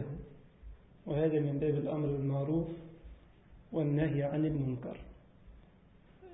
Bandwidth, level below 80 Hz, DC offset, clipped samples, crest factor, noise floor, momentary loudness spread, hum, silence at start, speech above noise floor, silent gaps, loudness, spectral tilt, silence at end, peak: 3.8 kHz; -56 dBFS; under 0.1%; under 0.1%; 16 dB; -61 dBFS; 19 LU; none; 0 s; 28 dB; none; -34 LUFS; -8.5 dB/octave; 0 s; -20 dBFS